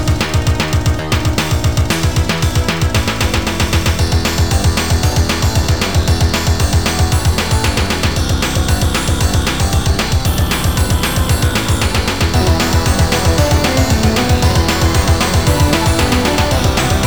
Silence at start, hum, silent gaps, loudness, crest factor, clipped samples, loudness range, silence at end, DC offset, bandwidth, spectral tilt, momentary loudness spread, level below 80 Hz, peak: 0 s; none; none; -14 LUFS; 14 dB; under 0.1%; 2 LU; 0 s; 3%; over 20 kHz; -4.5 dB/octave; 3 LU; -20 dBFS; 0 dBFS